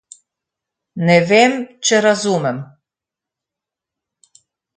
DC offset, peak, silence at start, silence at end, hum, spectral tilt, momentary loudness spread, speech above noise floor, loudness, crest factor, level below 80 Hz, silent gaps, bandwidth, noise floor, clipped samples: under 0.1%; 0 dBFS; 0.95 s; 2.1 s; none; -4 dB/octave; 12 LU; 72 dB; -15 LUFS; 18 dB; -66 dBFS; none; 9.6 kHz; -86 dBFS; under 0.1%